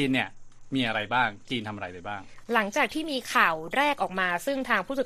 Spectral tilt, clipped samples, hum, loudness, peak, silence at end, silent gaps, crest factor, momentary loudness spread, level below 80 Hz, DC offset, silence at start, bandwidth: -4 dB/octave; under 0.1%; none; -27 LUFS; -6 dBFS; 0 s; none; 22 dB; 13 LU; -56 dBFS; under 0.1%; 0 s; 14.5 kHz